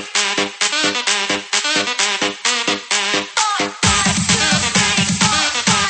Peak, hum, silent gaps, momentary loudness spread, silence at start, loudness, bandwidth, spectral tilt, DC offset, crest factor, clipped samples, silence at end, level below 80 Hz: -2 dBFS; none; none; 4 LU; 0 s; -15 LUFS; 9 kHz; -1.5 dB/octave; under 0.1%; 16 dB; under 0.1%; 0 s; -42 dBFS